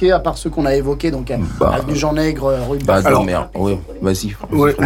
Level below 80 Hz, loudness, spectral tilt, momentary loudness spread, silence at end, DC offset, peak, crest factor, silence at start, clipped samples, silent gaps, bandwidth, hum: -30 dBFS; -17 LUFS; -6 dB/octave; 6 LU; 0 s; under 0.1%; -4 dBFS; 12 dB; 0 s; under 0.1%; none; 17 kHz; none